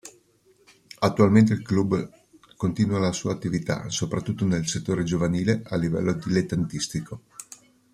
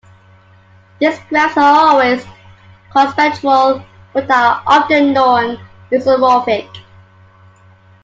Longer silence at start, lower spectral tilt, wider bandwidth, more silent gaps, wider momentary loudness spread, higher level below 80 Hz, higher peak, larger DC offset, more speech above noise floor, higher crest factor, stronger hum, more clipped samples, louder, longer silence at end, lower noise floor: second, 0.05 s vs 1 s; about the same, -6 dB/octave vs -5 dB/octave; first, 13.5 kHz vs 7.8 kHz; neither; about the same, 12 LU vs 11 LU; about the same, -54 dBFS vs -56 dBFS; second, -4 dBFS vs 0 dBFS; neither; about the same, 37 dB vs 34 dB; first, 20 dB vs 14 dB; neither; neither; second, -24 LUFS vs -12 LUFS; second, 0.5 s vs 1.25 s; first, -61 dBFS vs -45 dBFS